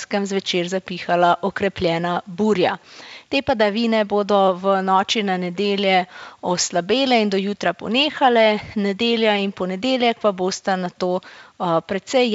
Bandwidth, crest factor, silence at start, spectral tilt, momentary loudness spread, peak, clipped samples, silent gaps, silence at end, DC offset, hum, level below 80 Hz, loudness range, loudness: 8 kHz; 16 dB; 0 s; -4.5 dB/octave; 7 LU; -2 dBFS; under 0.1%; none; 0 s; under 0.1%; none; -56 dBFS; 2 LU; -20 LUFS